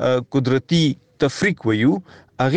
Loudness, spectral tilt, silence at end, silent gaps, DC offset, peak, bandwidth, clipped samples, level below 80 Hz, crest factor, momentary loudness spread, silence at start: -20 LUFS; -6 dB/octave; 0 s; none; under 0.1%; -6 dBFS; 9.4 kHz; under 0.1%; -52 dBFS; 14 dB; 5 LU; 0 s